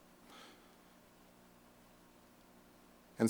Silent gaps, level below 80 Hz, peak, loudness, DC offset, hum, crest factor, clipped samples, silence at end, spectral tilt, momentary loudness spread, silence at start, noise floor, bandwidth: none; -76 dBFS; -18 dBFS; -61 LUFS; under 0.1%; 60 Hz at -70 dBFS; 26 dB; under 0.1%; 0 s; -6 dB/octave; 6 LU; 3.2 s; -64 dBFS; over 20 kHz